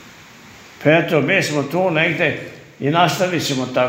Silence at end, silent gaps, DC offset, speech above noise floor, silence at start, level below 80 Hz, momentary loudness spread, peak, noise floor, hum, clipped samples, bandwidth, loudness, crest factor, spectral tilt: 0 s; none; under 0.1%; 25 dB; 0 s; -60 dBFS; 6 LU; 0 dBFS; -42 dBFS; none; under 0.1%; 16 kHz; -17 LUFS; 18 dB; -5 dB/octave